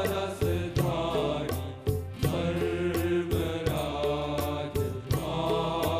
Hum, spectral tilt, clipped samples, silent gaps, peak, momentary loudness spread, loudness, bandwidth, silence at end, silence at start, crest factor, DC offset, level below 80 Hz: none; -6 dB/octave; under 0.1%; none; -14 dBFS; 4 LU; -30 LUFS; 16 kHz; 0 s; 0 s; 16 dB; under 0.1%; -44 dBFS